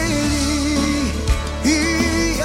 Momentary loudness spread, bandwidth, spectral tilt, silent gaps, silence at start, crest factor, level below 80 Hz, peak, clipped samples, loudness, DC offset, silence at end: 4 LU; 16.5 kHz; -4 dB/octave; none; 0 s; 14 dB; -26 dBFS; -4 dBFS; under 0.1%; -19 LUFS; under 0.1%; 0 s